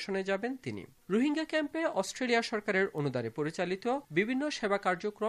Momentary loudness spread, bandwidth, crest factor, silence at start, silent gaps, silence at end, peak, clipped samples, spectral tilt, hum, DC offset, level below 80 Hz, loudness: 5 LU; 14.5 kHz; 18 dB; 0 s; none; 0 s; -14 dBFS; under 0.1%; -5 dB/octave; none; under 0.1%; -72 dBFS; -32 LUFS